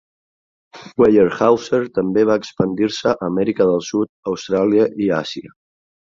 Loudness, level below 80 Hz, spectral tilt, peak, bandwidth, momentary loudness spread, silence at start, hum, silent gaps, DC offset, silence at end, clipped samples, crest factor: -17 LUFS; -54 dBFS; -6 dB/octave; -2 dBFS; 7.6 kHz; 9 LU; 0.75 s; none; 4.09-4.23 s; under 0.1%; 0.7 s; under 0.1%; 16 dB